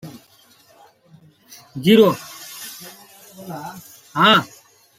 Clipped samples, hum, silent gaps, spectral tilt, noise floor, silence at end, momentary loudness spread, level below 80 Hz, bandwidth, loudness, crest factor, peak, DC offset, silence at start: under 0.1%; none; none; -5 dB/octave; -53 dBFS; 0.55 s; 26 LU; -64 dBFS; 16.5 kHz; -16 LUFS; 20 dB; -2 dBFS; under 0.1%; 0.05 s